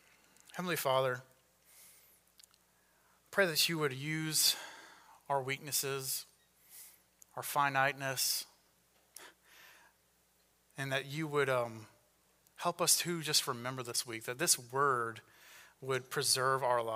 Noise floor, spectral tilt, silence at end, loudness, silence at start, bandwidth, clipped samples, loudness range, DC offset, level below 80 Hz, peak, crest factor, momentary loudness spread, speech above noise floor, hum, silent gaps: -72 dBFS; -2 dB/octave; 0 s; -33 LUFS; 0.55 s; 16 kHz; under 0.1%; 7 LU; under 0.1%; -82 dBFS; -14 dBFS; 24 dB; 21 LU; 38 dB; none; none